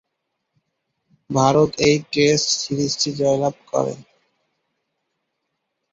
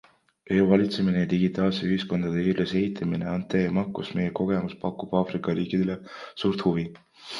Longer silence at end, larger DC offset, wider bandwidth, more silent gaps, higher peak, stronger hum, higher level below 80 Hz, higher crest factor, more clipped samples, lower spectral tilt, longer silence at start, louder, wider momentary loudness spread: first, 1.9 s vs 0 s; neither; first, 8 kHz vs 7.2 kHz; neither; first, -2 dBFS vs -6 dBFS; neither; about the same, -56 dBFS vs -54 dBFS; about the same, 20 dB vs 20 dB; neither; second, -4 dB/octave vs -8 dB/octave; first, 1.3 s vs 0.5 s; first, -19 LUFS vs -26 LUFS; about the same, 8 LU vs 8 LU